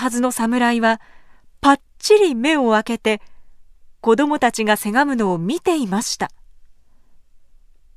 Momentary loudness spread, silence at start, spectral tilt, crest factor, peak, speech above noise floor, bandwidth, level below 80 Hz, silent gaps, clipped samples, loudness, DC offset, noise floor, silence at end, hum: 7 LU; 0 s; -4 dB/octave; 18 dB; 0 dBFS; 29 dB; 15.5 kHz; -52 dBFS; none; under 0.1%; -18 LUFS; under 0.1%; -47 dBFS; 1.3 s; none